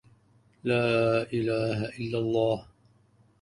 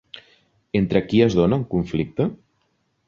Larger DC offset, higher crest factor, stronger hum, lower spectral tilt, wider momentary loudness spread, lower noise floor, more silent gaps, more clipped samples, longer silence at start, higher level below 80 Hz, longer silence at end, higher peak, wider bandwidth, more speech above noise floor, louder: neither; about the same, 16 dB vs 18 dB; neither; about the same, -7 dB/octave vs -8 dB/octave; about the same, 8 LU vs 9 LU; second, -63 dBFS vs -69 dBFS; neither; neither; first, 0.65 s vs 0.15 s; second, -60 dBFS vs -46 dBFS; about the same, 0.8 s vs 0.75 s; second, -14 dBFS vs -4 dBFS; first, 11 kHz vs 7.2 kHz; second, 36 dB vs 49 dB; second, -28 LUFS vs -21 LUFS